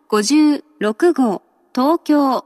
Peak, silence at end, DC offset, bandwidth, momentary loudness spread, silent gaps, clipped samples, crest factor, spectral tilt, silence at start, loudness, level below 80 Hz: -4 dBFS; 0.05 s; under 0.1%; 13.5 kHz; 9 LU; none; under 0.1%; 12 dB; -4.5 dB/octave; 0.1 s; -16 LUFS; -72 dBFS